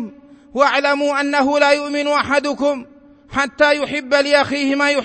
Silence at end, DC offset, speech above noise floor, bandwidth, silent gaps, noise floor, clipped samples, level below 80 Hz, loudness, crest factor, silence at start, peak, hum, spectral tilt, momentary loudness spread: 0 s; under 0.1%; 21 dB; 8.8 kHz; none; -38 dBFS; under 0.1%; -54 dBFS; -16 LUFS; 16 dB; 0 s; -2 dBFS; none; -3 dB/octave; 7 LU